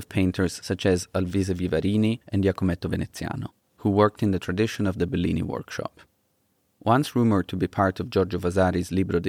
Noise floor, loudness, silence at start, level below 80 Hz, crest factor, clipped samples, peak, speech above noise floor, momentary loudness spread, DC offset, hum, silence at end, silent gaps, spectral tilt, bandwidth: -70 dBFS; -25 LUFS; 0 s; -54 dBFS; 18 dB; under 0.1%; -6 dBFS; 46 dB; 9 LU; under 0.1%; none; 0 s; none; -6.5 dB/octave; 15.5 kHz